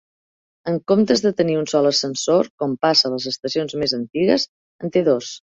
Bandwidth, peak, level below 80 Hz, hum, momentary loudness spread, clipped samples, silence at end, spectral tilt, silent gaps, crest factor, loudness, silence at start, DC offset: 8.2 kHz; -2 dBFS; -60 dBFS; none; 9 LU; under 0.1%; 0.2 s; -4.5 dB/octave; 2.50-2.58 s, 4.48-4.79 s; 18 dB; -19 LUFS; 0.65 s; under 0.1%